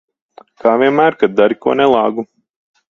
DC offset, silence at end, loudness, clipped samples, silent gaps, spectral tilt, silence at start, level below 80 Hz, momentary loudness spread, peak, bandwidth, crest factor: under 0.1%; 0.65 s; -13 LUFS; under 0.1%; none; -7 dB/octave; 0.65 s; -58 dBFS; 8 LU; 0 dBFS; 6.8 kHz; 14 dB